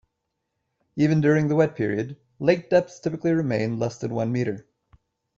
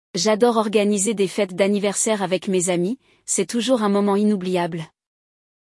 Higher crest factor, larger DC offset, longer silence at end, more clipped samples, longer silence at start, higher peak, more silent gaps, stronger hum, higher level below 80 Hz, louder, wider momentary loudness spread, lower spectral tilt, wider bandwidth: about the same, 18 dB vs 16 dB; neither; second, 0.75 s vs 0.9 s; neither; first, 0.95 s vs 0.15 s; about the same, -6 dBFS vs -6 dBFS; neither; neither; first, -60 dBFS vs -68 dBFS; second, -23 LUFS vs -20 LUFS; first, 10 LU vs 7 LU; first, -7.5 dB/octave vs -4 dB/octave; second, 7.6 kHz vs 12 kHz